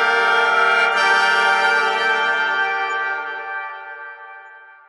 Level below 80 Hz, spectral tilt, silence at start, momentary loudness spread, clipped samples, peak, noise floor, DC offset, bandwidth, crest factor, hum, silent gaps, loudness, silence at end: -80 dBFS; -0.5 dB/octave; 0 s; 18 LU; under 0.1%; -4 dBFS; -42 dBFS; under 0.1%; 11.5 kHz; 14 dB; none; none; -17 LUFS; 0.2 s